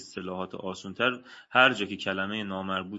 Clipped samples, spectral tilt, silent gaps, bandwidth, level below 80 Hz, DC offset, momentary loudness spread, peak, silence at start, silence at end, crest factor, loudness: under 0.1%; -4.5 dB/octave; none; 8 kHz; -74 dBFS; under 0.1%; 15 LU; -4 dBFS; 0 s; 0 s; 24 dB; -28 LUFS